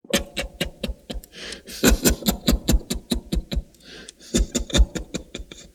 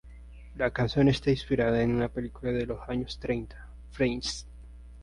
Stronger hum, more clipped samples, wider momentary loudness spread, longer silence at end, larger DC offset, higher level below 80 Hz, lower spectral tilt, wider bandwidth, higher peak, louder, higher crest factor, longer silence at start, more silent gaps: neither; neither; about the same, 18 LU vs 20 LU; about the same, 0.05 s vs 0 s; neither; first, -28 dBFS vs -44 dBFS; second, -4 dB/octave vs -6 dB/octave; first, 19 kHz vs 11.5 kHz; first, -2 dBFS vs -14 dBFS; first, -24 LUFS vs -29 LUFS; first, 22 dB vs 16 dB; about the same, 0.1 s vs 0.05 s; neither